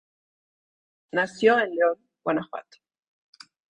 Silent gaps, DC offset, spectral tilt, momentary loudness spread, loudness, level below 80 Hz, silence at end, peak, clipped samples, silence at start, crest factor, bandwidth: none; under 0.1%; -5 dB/octave; 13 LU; -24 LUFS; -74 dBFS; 1.15 s; -6 dBFS; under 0.1%; 1.15 s; 22 dB; 9.8 kHz